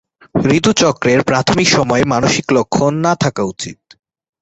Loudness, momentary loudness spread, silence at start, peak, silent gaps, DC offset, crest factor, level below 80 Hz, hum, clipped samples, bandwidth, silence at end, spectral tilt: -14 LUFS; 9 LU; 0.35 s; 0 dBFS; none; under 0.1%; 14 dB; -44 dBFS; none; under 0.1%; 8.2 kHz; 0.7 s; -4.5 dB/octave